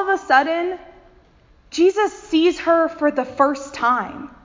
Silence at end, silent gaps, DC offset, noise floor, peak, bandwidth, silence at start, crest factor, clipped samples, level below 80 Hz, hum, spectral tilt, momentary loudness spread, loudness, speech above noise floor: 0.15 s; none; under 0.1%; -52 dBFS; -2 dBFS; 7.6 kHz; 0 s; 18 dB; under 0.1%; -54 dBFS; none; -3.5 dB/octave; 10 LU; -19 LUFS; 34 dB